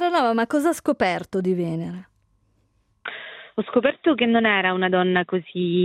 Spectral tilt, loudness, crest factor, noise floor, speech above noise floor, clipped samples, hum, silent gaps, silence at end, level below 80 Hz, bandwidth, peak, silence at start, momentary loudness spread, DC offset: -6 dB/octave; -21 LUFS; 18 dB; -65 dBFS; 44 dB; under 0.1%; none; none; 0 s; -64 dBFS; 15 kHz; -4 dBFS; 0 s; 15 LU; under 0.1%